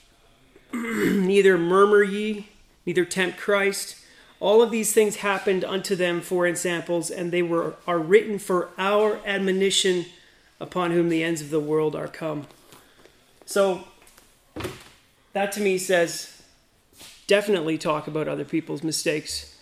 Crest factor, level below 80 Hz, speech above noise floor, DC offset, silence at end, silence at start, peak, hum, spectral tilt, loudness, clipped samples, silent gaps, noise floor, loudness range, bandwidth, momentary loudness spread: 20 dB; -60 dBFS; 36 dB; under 0.1%; 0.15 s; 0.75 s; -4 dBFS; none; -4 dB/octave; -23 LUFS; under 0.1%; none; -59 dBFS; 6 LU; 16 kHz; 14 LU